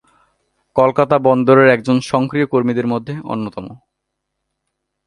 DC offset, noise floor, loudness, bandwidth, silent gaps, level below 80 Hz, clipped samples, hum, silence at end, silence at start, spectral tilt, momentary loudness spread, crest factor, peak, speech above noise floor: under 0.1%; -76 dBFS; -15 LUFS; 11.5 kHz; none; -56 dBFS; under 0.1%; none; 1.3 s; 0.75 s; -7 dB/octave; 14 LU; 16 dB; 0 dBFS; 61 dB